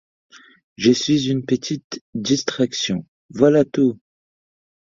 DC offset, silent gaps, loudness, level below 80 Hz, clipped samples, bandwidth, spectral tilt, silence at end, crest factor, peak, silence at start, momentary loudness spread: under 0.1%; 1.84-1.90 s, 2.01-2.13 s, 3.08-3.29 s; -20 LUFS; -58 dBFS; under 0.1%; 7.6 kHz; -5 dB/octave; 0.9 s; 20 dB; -2 dBFS; 0.8 s; 13 LU